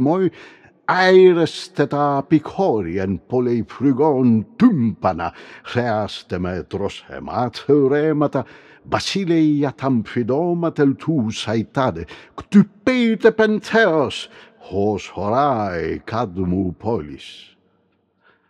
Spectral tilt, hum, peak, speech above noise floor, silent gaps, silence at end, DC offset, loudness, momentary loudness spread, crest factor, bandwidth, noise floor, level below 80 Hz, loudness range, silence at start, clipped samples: -6.5 dB/octave; none; -2 dBFS; 45 dB; none; 1.1 s; under 0.1%; -19 LUFS; 11 LU; 18 dB; 10.5 kHz; -63 dBFS; -54 dBFS; 5 LU; 0 s; under 0.1%